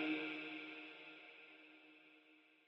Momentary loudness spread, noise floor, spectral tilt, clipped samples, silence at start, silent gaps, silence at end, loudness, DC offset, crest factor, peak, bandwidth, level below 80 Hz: 22 LU; -70 dBFS; -5 dB/octave; under 0.1%; 0 s; none; 0.05 s; -49 LUFS; under 0.1%; 20 dB; -30 dBFS; 6 kHz; under -90 dBFS